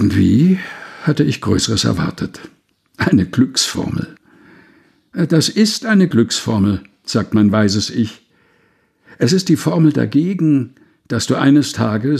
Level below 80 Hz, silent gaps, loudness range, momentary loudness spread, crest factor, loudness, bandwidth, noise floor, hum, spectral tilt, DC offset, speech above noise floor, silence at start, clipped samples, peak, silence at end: -46 dBFS; none; 3 LU; 10 LU; 14 dB; -15 LUFS; 14.5 kHz; -58 dBFS; none; -5.5 dB/octave; under 0.1%; 43 dB; 0 s; under 0.1%; 0 dBFS; 0 s